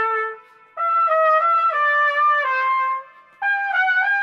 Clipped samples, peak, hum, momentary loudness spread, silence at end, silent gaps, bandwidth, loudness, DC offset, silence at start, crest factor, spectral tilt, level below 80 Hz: under 0.1%; -6 dBFS; none; 9 LU; 0 s; none; 7.2 kHz; -18 LUFS; under 0.1%; 0 s; 12 dB; 0.5 dB/octave; -86 dBFS